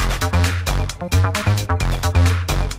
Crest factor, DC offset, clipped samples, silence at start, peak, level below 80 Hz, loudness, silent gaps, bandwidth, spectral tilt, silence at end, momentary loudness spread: 14 dB; under 0.1%; under 0.1%; 0 s; -4 dBFS; -24 dBFS; -19 LUFS; none; 16 kHz; -5 dB/octave; 0 s; 4 LU